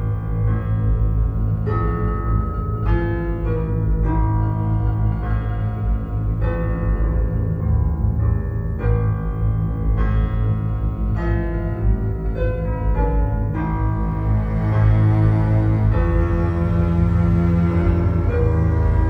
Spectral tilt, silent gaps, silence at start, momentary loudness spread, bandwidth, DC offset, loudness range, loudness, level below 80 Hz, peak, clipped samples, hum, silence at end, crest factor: -11 dB/octave; none; 0 s; 6 LU; 3.7 kHz; under 0.1%; 4 LU; -20 LUFS; -22 dBFS; -6 dBFS; under 0.1%; none; 0 s; 12 dB